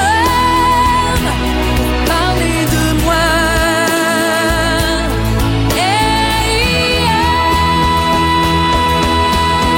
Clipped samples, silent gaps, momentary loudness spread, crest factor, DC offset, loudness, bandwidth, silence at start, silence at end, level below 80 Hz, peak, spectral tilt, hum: under 0.1%; none; 3 LU; 10 dB; under 0.1%; -12 LUFS; 17 kHz; 0 s; 0 s; -22 dBFS; -2 dBFS; -4 dB/octave; none